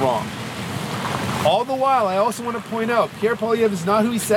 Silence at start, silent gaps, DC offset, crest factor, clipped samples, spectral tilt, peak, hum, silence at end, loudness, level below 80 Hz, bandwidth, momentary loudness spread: 0 s; none; under 0.1%; 16 dB; under 0.1%; -5 dB/octave; -4 dBFS; none; 0 s; -21 LUFS; -54 dBFS; 18 kHz; 9 LU